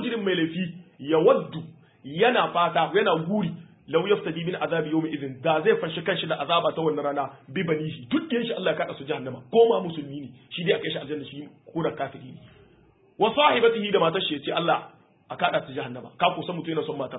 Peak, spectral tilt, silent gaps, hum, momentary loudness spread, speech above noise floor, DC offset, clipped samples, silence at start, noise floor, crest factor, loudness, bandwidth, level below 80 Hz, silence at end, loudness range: -4 dBFS; -10 dB/octave; none; none; 15 LU; 33 dB; under 0.1%; under 0.1%; 0 s; -58 dBFS; 22 dB; -25 LUFS; 4 kHz; -68 dBFS; 0 s; 3 LU